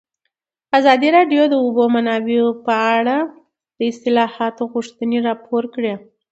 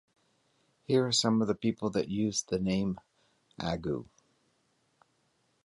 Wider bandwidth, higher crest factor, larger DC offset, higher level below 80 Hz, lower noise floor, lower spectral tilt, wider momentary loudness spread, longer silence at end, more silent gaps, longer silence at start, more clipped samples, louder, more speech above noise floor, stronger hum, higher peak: second, 8 kHz vs 11.5 kHz; about the same, 18 dB vs 20 dB; neither; second, -70 dBFS vs -60 dBFS; about the same, -75 dBFS vs -74 dBFS; about the same, -5.5 dB/octave vs -4.5 dB/octave; about the same, 11 LU vs 10 LU; second, 0.35 s vs 1.6 s; neither; second, 0.75 s vs 0.9 s; neither; first, -17 LUFS vs -31 LUFS; first, 59 dB vs 43 dB; neither; first, 0 dBFS vs -12 dBFS